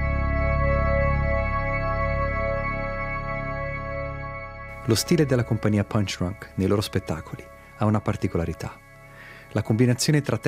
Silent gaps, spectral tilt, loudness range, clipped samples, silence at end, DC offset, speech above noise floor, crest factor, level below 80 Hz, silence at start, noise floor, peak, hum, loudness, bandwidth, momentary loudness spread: none; -6 dB/octave; 3 LU; under 0.1%; 0 s; under 0.1%; 22 dB; 18 dB; -32 dBFS; 0 s; -45 dBFS; -6 dBFS; none; -25 LUFS; 15.5 kHz; 13 LU